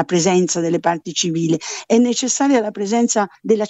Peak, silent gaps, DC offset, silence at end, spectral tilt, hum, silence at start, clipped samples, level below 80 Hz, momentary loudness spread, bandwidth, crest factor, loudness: -2 dBFS; none; under 0.1%; 0 s; -4 dB/octave; none; 0 s; under 0.1%; -64 dBFS; 4 LU; 8.4 kHz; 14 dB; -17 LUFS